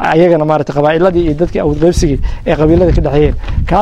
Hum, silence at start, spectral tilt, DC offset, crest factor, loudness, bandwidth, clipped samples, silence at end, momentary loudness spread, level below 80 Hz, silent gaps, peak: none; 0 s; -7 dB/octave; under 0.1%; 10 dB; -11 LUFS; 11.5 kHz; under 0.1%; 0 s; 6 LU; -18 dBFS; none; 0 dBFS